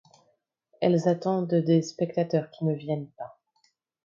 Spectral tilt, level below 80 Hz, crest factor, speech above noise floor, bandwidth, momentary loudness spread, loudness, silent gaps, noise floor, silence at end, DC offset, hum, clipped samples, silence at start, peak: -7.5 dB/octave; -74 dBFS; 18 dB; 46 dB; 7.4 kHz; 12 LU; -26 LUFS; none; -71 dBFS; 0.75 s; under 0.1%; none; under 0.1%; 0.8 s; -10 dBFS